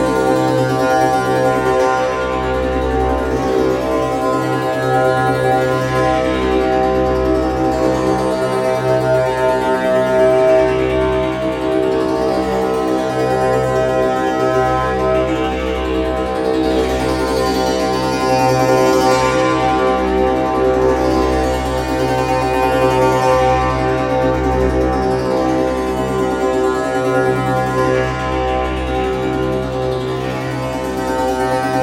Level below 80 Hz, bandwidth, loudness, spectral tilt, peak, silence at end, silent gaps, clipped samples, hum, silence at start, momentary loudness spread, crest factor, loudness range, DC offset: -30 dBFS; 16.5 kHz; -16 LUFS; -6 dB/octave; -2 dBFS; 0 s; none; under 0.1%; none; 0 s; 5 LU; 14 dB; 2 LU; under 0.1%